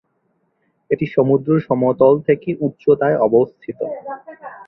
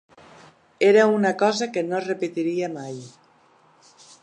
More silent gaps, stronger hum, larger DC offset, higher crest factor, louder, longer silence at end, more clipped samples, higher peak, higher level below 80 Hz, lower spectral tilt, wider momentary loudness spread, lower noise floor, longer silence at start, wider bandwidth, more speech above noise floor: neither; neither; neither; about the same, 16 dB vs 18 dB; first, -17 LUFS vs -21 LUFS; second, 0.05 s vs 1.15 s; neither; first, -2 dBFS vs -6 dBFS; first, -58 dBFS vs -76 dBFS; first, -11.5 dB/octave vs -5 dB/octave; about the same, 14 LU vs 16 LU; first, -66 dBFS vs -57 dBFS; about the same, 0.9 s vs 0.8 s; second, 4.1 kHz vs 10.5 kHz; first, 49 dB vs 36 dB